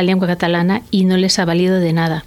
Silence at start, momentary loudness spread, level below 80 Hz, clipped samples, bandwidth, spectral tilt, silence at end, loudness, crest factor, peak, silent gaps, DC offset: 0 s; 2 LU; -48 dBFS; under 0.1%; 13 kHz; -5.5 dB/octave; 0.05 s; -15 LUFS; 12 dB; -2 dBFS; none; under 0.1%